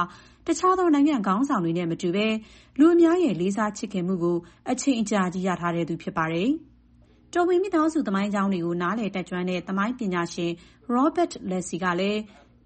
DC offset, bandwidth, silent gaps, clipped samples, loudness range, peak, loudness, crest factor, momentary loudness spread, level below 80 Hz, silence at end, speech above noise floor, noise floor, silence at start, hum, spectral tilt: under 0.1%; 8.8 kHz; none; under 0.1%; 5 LU; -8 dBFS; -25 LUFS; 16 dB; 10 LU; -58 dBFS; 0.4 s; 32 dB; -56 dBFS; 0 s; none; -6 dB/octave